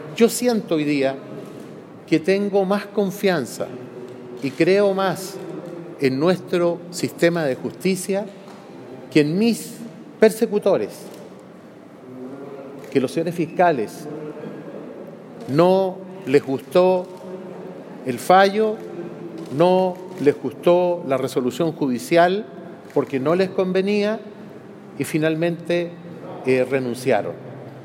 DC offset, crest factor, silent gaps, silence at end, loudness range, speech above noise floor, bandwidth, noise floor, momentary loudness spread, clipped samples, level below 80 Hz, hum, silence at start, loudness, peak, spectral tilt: under 0.1%; 20 dB; none; 0 s; 4 LU; 23 dB; 17 kHz; -42 dBFS; 19 LU; under 0.1%; -72 dBFS; none; 0 s; -20 LUFS; -2 dBFS; -5.5 dB/octave